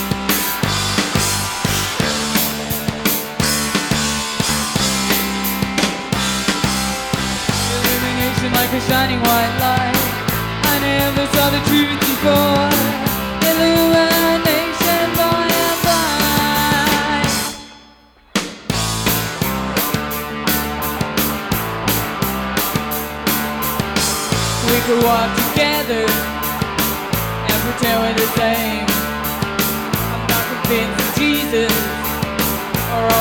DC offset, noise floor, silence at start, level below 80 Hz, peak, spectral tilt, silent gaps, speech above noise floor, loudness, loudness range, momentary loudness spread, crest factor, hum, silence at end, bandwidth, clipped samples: under 0.1%; -47 dBFS; 0 s; -36 dBFS; -2 dBFS; -3.5 dB/octave; none; 32 dB; -17 LUFS; 4 LU; 6 LU; 16 dB; none; 0 s; 19.5 kHz; under 0.1%